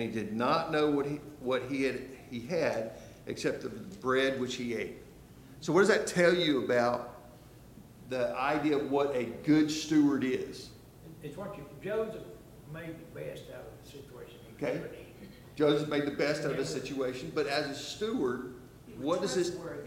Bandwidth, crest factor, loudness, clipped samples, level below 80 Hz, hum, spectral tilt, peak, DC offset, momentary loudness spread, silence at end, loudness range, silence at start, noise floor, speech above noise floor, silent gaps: 16.5 kHz; 20 dB; -31 LUFS; under 0.1%; -62 dBFS; none; -5 dB/octave; -12 dBFS; under 0.1%; 21 LU; 0 s; 12 LU; 0 s; -53 dBFS; 22 dB; none